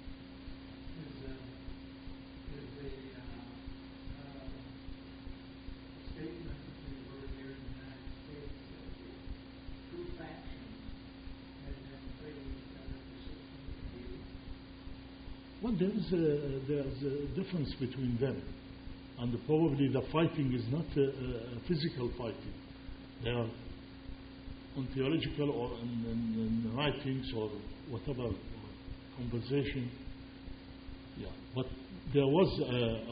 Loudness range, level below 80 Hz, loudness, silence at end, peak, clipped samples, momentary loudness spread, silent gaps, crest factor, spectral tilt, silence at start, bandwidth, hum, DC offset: 14 LU; -52 dBFS; -37 LUFS; 0 s; -16 dBFS; under 0.1%; 18 LU; none; 22 dB; -6 dB/octave; 0 s; 5 kHz; 60 Hz at -55 dBFS; under 0.1%